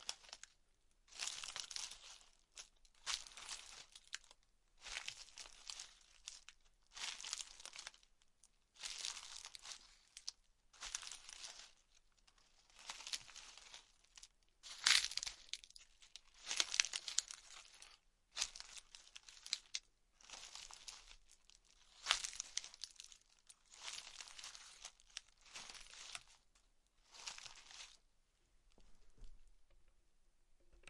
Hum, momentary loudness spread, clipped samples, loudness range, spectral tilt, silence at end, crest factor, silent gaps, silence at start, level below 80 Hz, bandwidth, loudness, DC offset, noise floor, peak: none; 21 LU; under 0.1%; 14 LU; 3 dB/octave; 0 s; 42 dB; none; 0 s; -72 dBFS; 12 kHz; -45 LUFS; under 0.1%; -76 dBFS; -8 dBFS